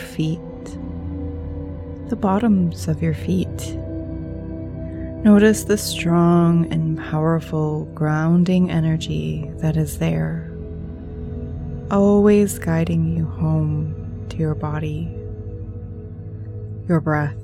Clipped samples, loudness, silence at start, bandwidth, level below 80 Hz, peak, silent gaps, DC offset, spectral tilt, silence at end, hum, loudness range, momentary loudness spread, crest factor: under 0.1%; -20 LUFS; 0 s; 14.5 kHz; -38 dBFS; -2 dBFS; none; under 0.1%; -7 dB/octave; 0 s; none; 7 LU; 17 LU; 18 dB